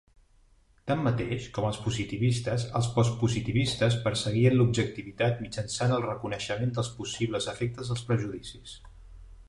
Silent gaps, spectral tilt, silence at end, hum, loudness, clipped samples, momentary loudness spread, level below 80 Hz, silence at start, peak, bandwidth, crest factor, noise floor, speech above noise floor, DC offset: none; -5.5 dB/octave; 0.05 s; none; -29 LUFS; under 0.1%; 9 LU; -52 dBFS; 0.85 s; -10 dBFS; 11.5 kHz; 18 dB; -61 dBFS; 33 dB; under 0.1%